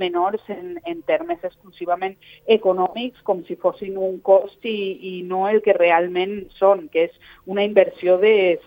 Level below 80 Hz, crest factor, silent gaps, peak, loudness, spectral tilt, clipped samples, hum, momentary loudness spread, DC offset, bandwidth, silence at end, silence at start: -62 dBFS; 18 dB; none; -2 dBFS; -20 LUFS; -7.5 dB/octave; under 0.1%; none; 13 LU; under 0.1%; 16.5 kHz; 0.05 s; 0 s